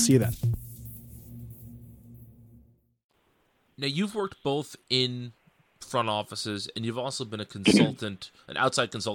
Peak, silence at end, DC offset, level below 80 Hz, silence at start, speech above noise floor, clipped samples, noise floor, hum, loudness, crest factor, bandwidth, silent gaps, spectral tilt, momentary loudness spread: -8 dBFS; 0 s; under 0.1%; -54 dBFS; 0 s; 41 dB; under 0.1%; -69 dBFS; none; -28 LUFS; 22 dB; over 20 kHz; 3.04-3.09 s; -4.5 dB/octave; 22 LU